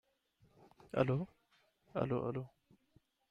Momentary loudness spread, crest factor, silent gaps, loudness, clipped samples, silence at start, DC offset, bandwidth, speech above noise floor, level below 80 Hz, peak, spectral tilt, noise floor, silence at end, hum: 13 LU; 24 dB; none; -39 LUFS; under 0.1%; 0.95 s; under 0.1%; 6.4 kHz; 38 dB; -68 dBFS; -18 dBFS; -9 dB/octave; -75 dBFS; 0.85 s; none